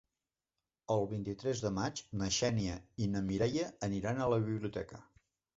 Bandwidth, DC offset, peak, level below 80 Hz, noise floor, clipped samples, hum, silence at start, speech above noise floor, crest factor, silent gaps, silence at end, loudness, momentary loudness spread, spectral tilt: 8 kHz; under 0.1%; -20 dBFS; -58 dBFS; under -90 dBFS; under 0.1%; none; 0.9 s; over 55 dB; 18 dB; none; 0.55 s; -36 LUFS; 8 LU; -5.5 dB/octave